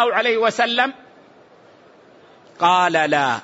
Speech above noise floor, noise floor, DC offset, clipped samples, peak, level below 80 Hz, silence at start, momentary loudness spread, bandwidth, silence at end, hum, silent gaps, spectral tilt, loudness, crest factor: 31 dB; -49 dBFS; under 0.1%; under 0.1%; -4 dBFS; -70 dBFS; 0 s; 4 LU; 8 kHz; 0 s; none; none; -3.5 dB/octave; -18 LUFS; 18 dB